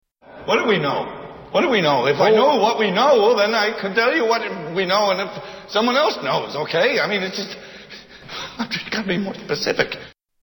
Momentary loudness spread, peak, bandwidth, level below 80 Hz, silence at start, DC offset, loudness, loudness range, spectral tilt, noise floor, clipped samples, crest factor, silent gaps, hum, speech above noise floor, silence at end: 17 LU; 0 dBFS; 18 kHz; -58 dBFS; 0.3 s; under 0.1%; -19 LUFS; 6 LU; -4.5 dB/octave; -41 dBFS; under 0.1%; 20 dB; none; none; 22 dB; 0.35 s